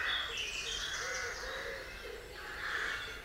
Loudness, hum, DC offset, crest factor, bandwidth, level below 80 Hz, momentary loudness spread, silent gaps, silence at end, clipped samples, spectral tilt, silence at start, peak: -38 LUFS; none; under 0.1%; 16 dB; 16 kHz; -56 dBFS; 10 LU; none; 0 s; under 0.1%; -0.5 dB/octave; 0 s; -24 dBFS